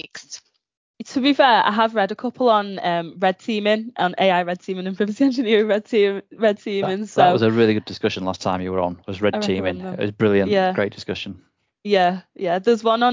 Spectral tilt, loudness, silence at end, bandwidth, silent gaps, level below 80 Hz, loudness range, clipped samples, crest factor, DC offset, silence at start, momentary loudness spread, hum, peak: -6 dB/octave; -20 LUFS; 0 s; 7.6 kHz; 0.77-0.94 s; -54 dBFS; 3 LU; under 0.1%; 18 dB; under 0.1%; 0.05 s; 11 LU; none; -2 dBFS